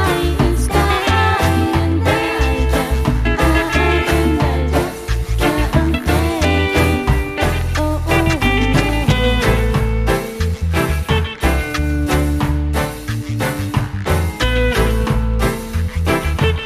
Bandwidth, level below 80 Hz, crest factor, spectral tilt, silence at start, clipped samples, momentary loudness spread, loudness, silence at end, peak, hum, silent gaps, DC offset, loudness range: 15.5 kHz; -20 dBFS; 14 dB; -5.5 dB/octave; 0 s; under 0.1%; 5 LU; -17 LUFS; 0 s; 0 dBFS; none; none; under 0.1%; 3 LU